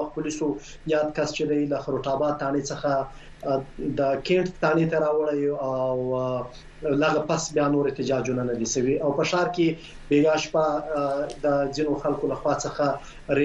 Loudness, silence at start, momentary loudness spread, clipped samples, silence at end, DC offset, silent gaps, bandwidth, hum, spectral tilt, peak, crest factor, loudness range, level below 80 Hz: -25 LUFS; 0 s; 6 LU; under 0.1%; 0 s; under 0.1%; none; 9.6 kHz; none; -5.5 dB/octave; -8 dBFS; 16 dB; 2 LU; -48 dBFS